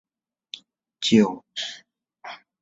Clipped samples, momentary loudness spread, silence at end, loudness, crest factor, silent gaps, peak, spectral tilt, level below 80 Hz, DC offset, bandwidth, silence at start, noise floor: under 0.1%; 22 LU; 0.25 s; -23 LUFS; 22 dB; none; -4 dBFS; -4.5 dB/octave; -66 dBFS; under 0.1%; 8 kHz; 1 s; -45 dBFS